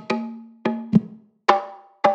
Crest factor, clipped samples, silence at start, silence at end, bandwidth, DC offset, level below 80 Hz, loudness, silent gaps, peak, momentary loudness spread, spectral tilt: 22 dB; under 0.1%; 0 s; 0 s; 8.2 kHz; under 0.1%; -64 dBFS; -23 LUFS; none; 0 dBFS; 16 LU; -7 dB/octave